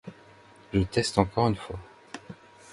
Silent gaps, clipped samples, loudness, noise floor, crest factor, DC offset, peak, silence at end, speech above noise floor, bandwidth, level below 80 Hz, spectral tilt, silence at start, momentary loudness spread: none; under 0.1%; -27 LUFS; -53 dBFS; 24 dB; under 0.1%; -6 dBFS; 0 s; 28 dB; 11.5 kHz; -46 dBFS; -6 dB/octave; 0.05 s; 22 LU